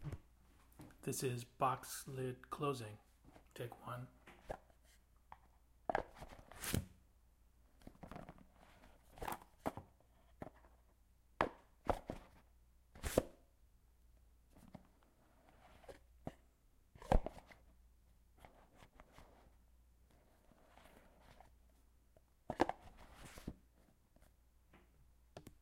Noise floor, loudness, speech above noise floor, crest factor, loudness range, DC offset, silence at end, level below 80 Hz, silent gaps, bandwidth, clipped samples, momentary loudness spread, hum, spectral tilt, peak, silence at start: -71 dBFS; -45 LUFS; 27 dB; 32 dB; 20 LU; under 0.1%; 0.1 s; -54 dBFS; none; 16 kHz; under 0.1%; 25 LU; none; -5 dB/octave; -16 dBFS; 0 s